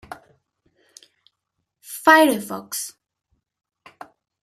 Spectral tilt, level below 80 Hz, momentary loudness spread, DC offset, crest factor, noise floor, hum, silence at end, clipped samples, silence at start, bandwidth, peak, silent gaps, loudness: -2.5 dB/octave; -68 dBFS; 26 LU; under 0.1%; 24 dB; -78 dBFS; none; 1.55 s; under 0.1%; 0.1 s; 15 kHz; -2 dBFS; none; -18 LUFS